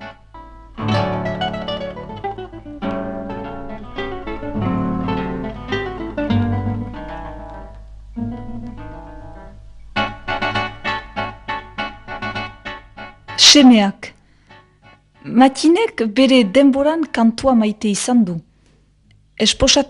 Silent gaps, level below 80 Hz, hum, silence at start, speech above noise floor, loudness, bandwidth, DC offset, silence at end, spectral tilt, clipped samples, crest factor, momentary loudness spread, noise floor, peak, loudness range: none; -38 dBFS; none; 0 s; 40 dB; -17 LUFS; 11 kHz; under 0.1%; 0 s; -4 dB/octave; under 0.1%; 18 dB; 21 LU; -54 dBFS; 0 dBFS; 12 LU